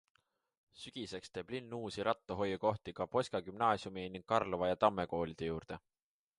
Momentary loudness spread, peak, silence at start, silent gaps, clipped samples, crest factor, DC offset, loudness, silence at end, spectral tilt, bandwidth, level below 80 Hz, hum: 12 LU; -14 dBFS; 0.75 s; none; under 0.1%; 24 dB; under 0.1%; -38 LUFS; 0.6 s; -5.5 dB/octave; 11.5 kHz; -64 dBFS; none